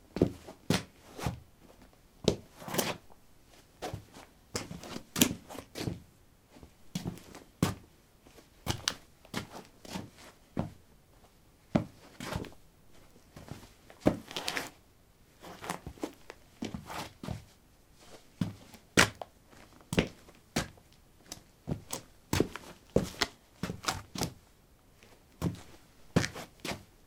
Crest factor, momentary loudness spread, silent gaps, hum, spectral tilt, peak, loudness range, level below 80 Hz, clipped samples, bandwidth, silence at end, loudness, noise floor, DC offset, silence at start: 36 dB; 20 LU; none; none; -4 dB/octave; -2 dBFS; 7 LU; -56 dBFS; under 0.1%; 17.5 kHz; 0.2 s; -36 LUFS; -62 dBFS; under 0.1%; 0.15 s